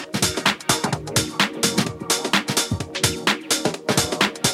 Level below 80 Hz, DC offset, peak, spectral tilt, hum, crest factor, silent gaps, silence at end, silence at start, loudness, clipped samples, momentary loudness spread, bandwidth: -48 dBFS; under 0.1%; -2 dBFS; -2.5 dB/octave; none; 20 dB; none; 0 s; 0 s; -21 LUFS; under 0.1%; 3 LU; 17 kHz